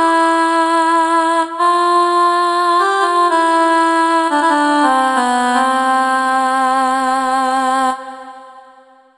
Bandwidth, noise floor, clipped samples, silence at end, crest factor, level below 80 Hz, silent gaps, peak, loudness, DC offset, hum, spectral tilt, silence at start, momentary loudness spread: 13 kHz; -45 dBFS; under 0.1%; 0.6 s; 12 dB; -58 dBFS; none; -2 dBFS; -13 LUFS; under 0.1%; none; -1 dB/octave; 0 s; 3 LU